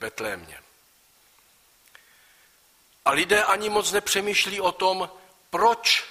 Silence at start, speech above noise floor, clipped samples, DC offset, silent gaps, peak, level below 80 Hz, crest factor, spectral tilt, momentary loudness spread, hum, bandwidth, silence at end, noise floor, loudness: 0 s; 36 dB; under 0.1%; under 0.1%; none; -6 dBFS; -62 dBFS; 20 dB; -1 dB/octave; 12 LU; none; 15.5 kHz; 0 s; -60 dBFS; -23 LUFS